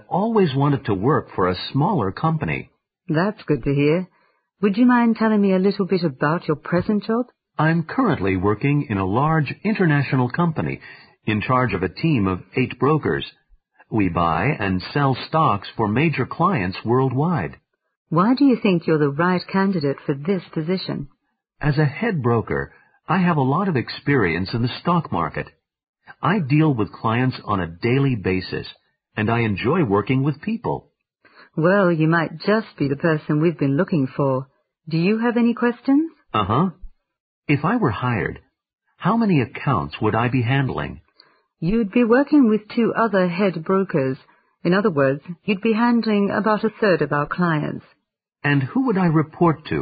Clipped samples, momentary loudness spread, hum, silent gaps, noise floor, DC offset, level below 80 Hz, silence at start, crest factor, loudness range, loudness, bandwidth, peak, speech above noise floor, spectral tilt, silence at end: under 0.1%; 8 LU; none; 17.97-18.05 s, 25.89-25.93 s, 37.20-37.42 s, 38.73-38.78 s; -66 dBFS; under 0.1%; -46 dBFS; 0.1 s; 16 dB; 3 LU; -20 LUFS; 5 kHz; -4 dBFS; 46 dB; -12.5 dB/octave; 0 s